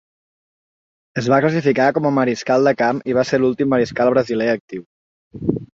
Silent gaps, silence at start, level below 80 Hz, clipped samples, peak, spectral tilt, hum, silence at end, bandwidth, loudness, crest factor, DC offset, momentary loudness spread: 4.60-4.68 s, 4.86-5.31 s; 1.15 s; -54 dBFS; under 0.1%; -2 dBFS; -6.5 dB/octave; none; 0.15 s; 7.8 kHz; -18 LUFS; 16 dB; under 0.1%; 9 LU